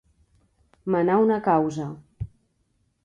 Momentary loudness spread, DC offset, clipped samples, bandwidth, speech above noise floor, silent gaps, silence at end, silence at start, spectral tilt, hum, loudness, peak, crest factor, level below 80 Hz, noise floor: 19 LU; under 0.1%; under 0.1%; 8 kHz; 48 dB; none; 0.8 s; 0.85 s; -8 dB/octave; none; -22 LUFS; -8 dBFS; 18 dB; -52 dBFS; -70 dBFS